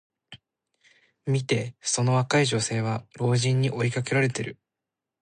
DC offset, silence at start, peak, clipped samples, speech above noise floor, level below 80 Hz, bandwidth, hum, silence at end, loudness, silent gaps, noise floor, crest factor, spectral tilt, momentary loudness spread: under 0.1%; 0.3 s; -10 dBFS; under 0.1%; 63 dB; -64 dBFS; 10 kHz; none; 0.7 s; -25 LUFS; none; -87 dBFS; 18 dB; -5 dB/octave; 7 LU